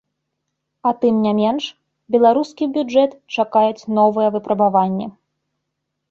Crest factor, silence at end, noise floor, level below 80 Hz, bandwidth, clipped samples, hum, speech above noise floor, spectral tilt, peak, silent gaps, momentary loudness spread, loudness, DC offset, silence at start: 16 dB; 1 s; -77 dBFS; -64 dBFS; 7.4 kHz; under 0.1%; none; 60 dB; -7 dB/octave; -2 dBFS; none; 8 LU; -18 LUFS; under 0.1%; 0.85 s